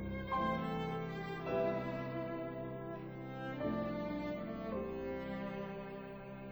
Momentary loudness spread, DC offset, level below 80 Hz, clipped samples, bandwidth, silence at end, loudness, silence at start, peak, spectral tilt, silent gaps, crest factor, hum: 10 LU; under 0.1%; -58 dBFS; under 0.1%; over 20 kHz; 0 s; -41 LUFS; 0 s; -24 dBFS; -8 dB/octave; none; 16 dB; none